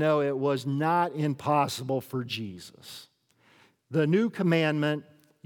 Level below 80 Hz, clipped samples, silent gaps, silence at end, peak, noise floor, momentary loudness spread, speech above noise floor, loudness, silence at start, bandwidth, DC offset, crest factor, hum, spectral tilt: -80 dBFS; under 0.1%; none; 0.45 s; -10 dBFS; -64 dBFS; 18 LU; 37 dB; -27 LUFS; 0 s; 19 kHz; under 0.1%; 18 dB; none; -6.5 dB/octave